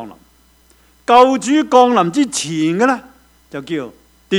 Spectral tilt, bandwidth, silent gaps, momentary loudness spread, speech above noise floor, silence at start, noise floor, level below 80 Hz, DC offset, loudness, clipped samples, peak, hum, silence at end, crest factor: -4.5 dB/octave; 13.5 kHz; none; 21 LU; 38 dB; 0 s; -52 dBFS; -56 dBFS; under 0.1%; -14 LUFS; 0.1%; 0 dBFS; none; 0 s; 16 dB